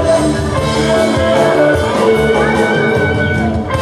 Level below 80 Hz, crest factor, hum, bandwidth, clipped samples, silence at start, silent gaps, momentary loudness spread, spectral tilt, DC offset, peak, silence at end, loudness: -30 dBFS; 12 dB; none; 14 kHz; under 0.1%; 0 s; none; 4 LU; -5.5 dB/octave; 0.1%; 0 dBFS; 0 s; -12 LUFS